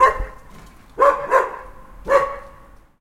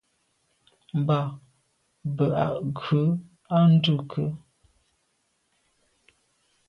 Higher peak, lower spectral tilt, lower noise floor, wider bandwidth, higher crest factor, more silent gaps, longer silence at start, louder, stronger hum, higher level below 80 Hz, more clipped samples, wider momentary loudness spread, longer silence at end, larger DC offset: first, -2 dBFS vs -10 dBFS; second, -4.5 dB/octave vs -9 dB/octave; second, -46 dBFS vs -72 dBFS; first, 14.5 kHz vs 5.8 kHz; about the same, 18 dB vs 18 dB; neither; second, 0 s vs 0.95 s; first, -19 LUFS vs -25 LUFS; neither; first, -38 dBFS vs -62 dBFS; neither; first, 20 LU vs 15 LU; second, 0.5 s vs 2.3 s; neither